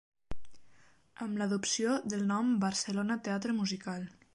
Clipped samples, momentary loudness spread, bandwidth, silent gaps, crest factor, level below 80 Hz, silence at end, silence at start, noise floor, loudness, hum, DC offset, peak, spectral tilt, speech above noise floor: under 0.1%; 18 LU; 11.5 kHz; none; 16 dB; -60 dBFS; 0.1 s; 0.15 s; -63 dBFS; -33 LUFS; none; under 0.1%; -18 dBFS; -4 dB/octave; 30 dB